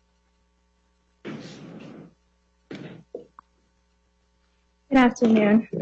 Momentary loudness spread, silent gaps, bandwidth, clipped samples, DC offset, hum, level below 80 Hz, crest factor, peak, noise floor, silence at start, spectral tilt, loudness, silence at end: 25 LU; none; 7.6 kHz; under 0.1%; under 0.1%; none; -58 dBFS; 20 dB; -8 dBFS; -67 dBFS; 1.25 s; -6.5 dB/octave; -19 LUFS; 0 s